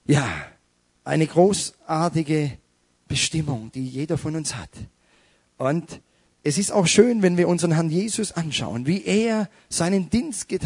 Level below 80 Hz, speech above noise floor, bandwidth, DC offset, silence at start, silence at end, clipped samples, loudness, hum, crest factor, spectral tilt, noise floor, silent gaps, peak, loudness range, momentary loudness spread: -52 dBFS; 43 dB; 11 kHz; under 0.1%; 0.1 s; 0 s; under 0.1%; -22 LUFS; none; 20 dB; -5 dB/octave; -64 dBFS; none; -2 dBFS; 7 LU; 12 LU